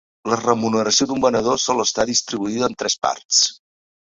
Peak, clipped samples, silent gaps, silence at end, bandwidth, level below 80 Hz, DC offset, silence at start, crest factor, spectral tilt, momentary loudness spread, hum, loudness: 0 dBFS; under 0.1%; 3.25-3.29 s; 0.5 s; 7.8 kHz; -54 dBFS; under 0.1%; 0.25 s; 20 dB; -2.5 dB/octave; 6 LU; none; -19 LUFS